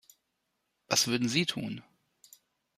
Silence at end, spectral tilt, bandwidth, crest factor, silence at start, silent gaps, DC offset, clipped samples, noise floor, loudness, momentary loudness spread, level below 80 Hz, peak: 0.95 s; -3 dB/octave; 15.5 kHz; 26 dB; 0.9 s; none; under 0.1%; under 0.1%; -81 dBFS; -29 LUFS; 14 LU; -72 dBFS; -8 dBFS